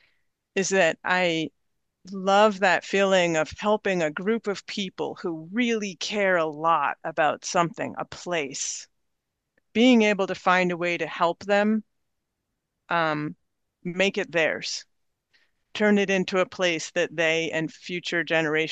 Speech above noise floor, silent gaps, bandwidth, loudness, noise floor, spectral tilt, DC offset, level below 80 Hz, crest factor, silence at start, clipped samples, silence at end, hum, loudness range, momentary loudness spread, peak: 56 dB; none; 9.2 kHz; -24 LUFS; -80 dBFS; -4 dB/octave; under 0.1%; -68 dBFS; 20 dB; 0.55 s; under 0.1%; 0 s; none; 4 LU; 11 LU; -6 dBFS